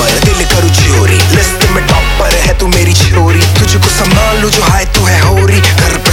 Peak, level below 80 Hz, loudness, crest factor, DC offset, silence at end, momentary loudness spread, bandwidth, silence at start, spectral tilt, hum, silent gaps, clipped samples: 0 dBFS; -14 dBFS; -8 LUFS; 8 dB; under 0.1%; 0 s; 2 LU; 17 kHz; 0 s; -4 dB/octave; none; none; 0.9%